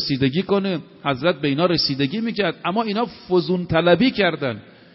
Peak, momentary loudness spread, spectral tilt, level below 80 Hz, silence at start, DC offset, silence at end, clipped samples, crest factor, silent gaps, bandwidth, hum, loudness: -2 dBFS; 9 LU; -4 dB/octave; -50 dBFS; 0 s; under 0.1%; 0.3 s; under 0.1%; 18 dB; none; 6 kHz; none; -20 LUFS